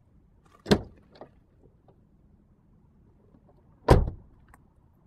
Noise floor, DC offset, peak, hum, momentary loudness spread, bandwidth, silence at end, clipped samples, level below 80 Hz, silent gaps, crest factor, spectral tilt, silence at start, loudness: -60 dBFS; under 0.1%; -2 dBFS; none; 29 LU; 14 kHz; 0.9 s; under 0.1%; -38 dBFS; none; 28 dB; -7 dB/octave; 0.65 s; -26 LUFS